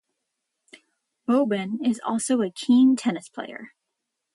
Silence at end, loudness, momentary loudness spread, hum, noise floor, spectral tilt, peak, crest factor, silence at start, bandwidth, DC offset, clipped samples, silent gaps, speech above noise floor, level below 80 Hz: 0.65 s; -23 LUFS; 18 LU; none; -81 dBFS; -5 dB/octave; -10 dBFS; 14 dB; 1.3 s; 11.5 kHz; under 0.1%; under 0.1%; none; 59 dB; -76 dBFS